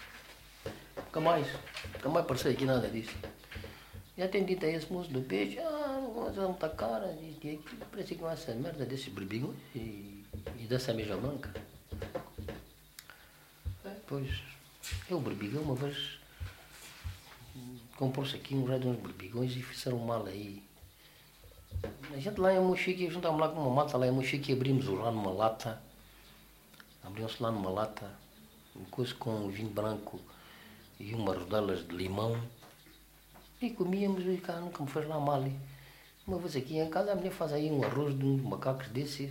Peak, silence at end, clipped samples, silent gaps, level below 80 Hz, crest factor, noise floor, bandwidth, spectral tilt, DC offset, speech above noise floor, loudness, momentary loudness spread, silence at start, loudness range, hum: -14 dBFS; 0 s; under 0.1%; none; -58 dBFS; 22 dB; -59 dBFS; 16 kHz; -6.5 dB/octave; under 0.1%; 25 dB; -35 LUFS; 19 LU; 0 s; 8 LU; none